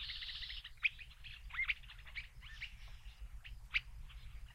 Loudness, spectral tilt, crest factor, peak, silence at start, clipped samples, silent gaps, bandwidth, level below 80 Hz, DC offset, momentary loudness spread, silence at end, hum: -42 LUFS; -1.5 dB/octave; 24 dB; -22 dBFS; 0 s; under 0.1%; none; 16 kHz; -54 dBFS; under 0.1%; 17 LU; 0 s; none